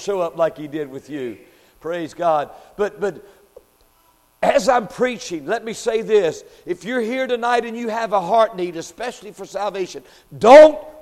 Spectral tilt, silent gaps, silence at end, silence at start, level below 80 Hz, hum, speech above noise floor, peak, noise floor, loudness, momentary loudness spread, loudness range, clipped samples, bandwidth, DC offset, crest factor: -4.5 dB/octave; none; 0 s; 0 s; -56 dBFS; none; 39 dB; 0 dBFS; -57 dBFS; -18 LUFS; 15 LU; 9 LU; under 0.1%; 13 kHz; under 0.1%; 18 dB